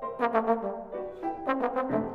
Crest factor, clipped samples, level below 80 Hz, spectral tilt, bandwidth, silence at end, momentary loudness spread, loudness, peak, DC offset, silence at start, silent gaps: 18 dB; under 0.1%; -60 dBFS; -8 dB/octave; 6 kHz; 0 s; 9 LU; -30 LUFS; -12 dBFS; under 0.1%; 0 s; none